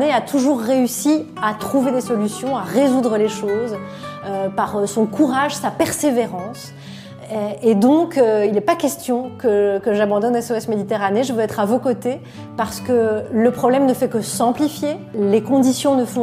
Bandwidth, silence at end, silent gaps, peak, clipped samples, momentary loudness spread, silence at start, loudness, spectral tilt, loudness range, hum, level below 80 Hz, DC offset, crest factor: 16 kHz; 0 s; none; -2 dBFS; under 0.1%; 10 LU; 0 s; -18 LUFS; -5 dB/octave; 3 LU; none; -58 dBFS; under 0.1%; 16 dB